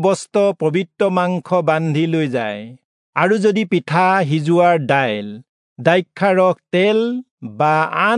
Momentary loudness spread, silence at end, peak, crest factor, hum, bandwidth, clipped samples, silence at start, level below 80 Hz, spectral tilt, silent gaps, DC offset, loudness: 8 LU; 0 s; -2 dBFS; 16 dB; none; 11 kHz; under 0.1%; 0 s; -70 dBFS; -6.5 dB/octave; 2.84-3.13 s, 5.49-5.76 s, 7.31-7.38 s; under 0.1%; -17 LUFS